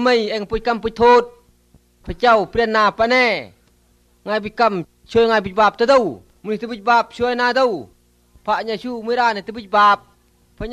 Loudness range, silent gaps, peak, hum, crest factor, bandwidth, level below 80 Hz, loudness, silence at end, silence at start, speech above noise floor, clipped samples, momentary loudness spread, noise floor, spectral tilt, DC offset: 3 LU; none; -2 dBFS; 60 Hz at -55 dBFS; 16 dB; 11 kHz; -44 dBFS; -17 LUFS; 0 s; 0 s; 40 dB; under 0.1%; 13 LU; -57 dBFS; -4.5 dB/octave; under 0.1%